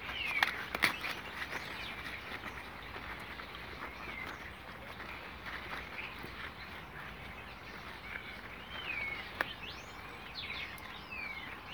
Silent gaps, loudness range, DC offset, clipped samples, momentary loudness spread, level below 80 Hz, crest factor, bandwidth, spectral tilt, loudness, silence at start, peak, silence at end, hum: none; 7 LU; under 0.1%; under 0.1%; 14 LU; -58 dBFS; 32 dB; over 20 kHz; -3 dB/octave; -40 LUFS; 0 s; -10 dBFS; 0 s; none